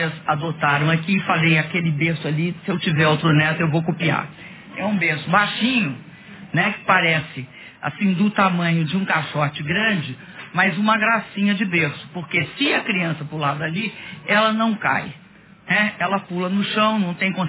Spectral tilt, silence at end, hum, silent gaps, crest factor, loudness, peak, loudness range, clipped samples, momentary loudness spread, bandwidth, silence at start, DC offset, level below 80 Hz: -9.5 dB/octave; 0 s; none; none; 18 dB; -20 LUFS; -2 dBFS; 2 LU; under 0.1%; 10 LU; 4 kHz; 0 s; under 0.1%; -58 dBFS